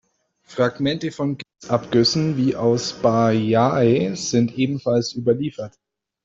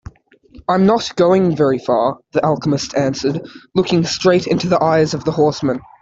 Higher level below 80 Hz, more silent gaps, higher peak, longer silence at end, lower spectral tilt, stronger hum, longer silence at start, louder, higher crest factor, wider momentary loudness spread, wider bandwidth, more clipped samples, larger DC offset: second, -56 dBFS vs -48 dBFS; neither; about the same, -2 dBFS vs -2 dBFS; first, 0.55 s vs 0.2 s; about the same, -5.5 dB/octave vs -6 dB/octave; neither; second, 0.5 s vs 0.7 s; second, -20 LUFS vs -16 LUFS; about the same, 18 dB vs 14 dB; about the same, 9 LU vs 7 LU; about the same, 7.8 kHz vs 7.8 kHz; neither; neither